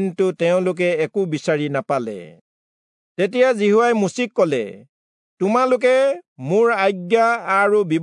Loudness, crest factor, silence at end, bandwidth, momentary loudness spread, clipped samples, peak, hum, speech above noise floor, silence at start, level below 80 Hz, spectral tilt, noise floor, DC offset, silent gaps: -18 LUFS; 16 dB; 0 s; 11 kHz; 8 LU; under 0.1%; -4 dBFS; none; over 72 dB; 0 s; -76 dBFS; -6 dB/octave; under -90 dBFS; under 0.1%; 2.41-3.15 s, 4.89-5.37 s, 6.28-6.36 s